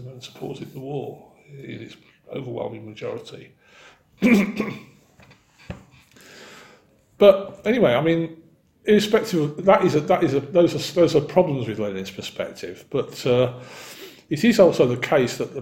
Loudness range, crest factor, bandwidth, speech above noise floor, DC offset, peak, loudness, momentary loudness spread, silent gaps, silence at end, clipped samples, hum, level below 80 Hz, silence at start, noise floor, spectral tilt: 12 LU; 22 dB; 16.5 kHz; 34 dB; under 0.1%; 0 dBFS; -21 LUFS; 22 LU; none; 0 s; under 0.1%; none; -56 dBFS; 0 s; -55 dBFS; -6 dB/octave